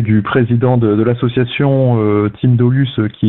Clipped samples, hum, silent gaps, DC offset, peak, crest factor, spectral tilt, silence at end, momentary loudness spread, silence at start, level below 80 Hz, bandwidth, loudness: under 0.1%; none; none; 0.2%; 0 dBFS; 12 dB; -13 dB/octave; 0 s; 3 LU; 0 s; -44 dBFS; 4 kHz; -13 LUFS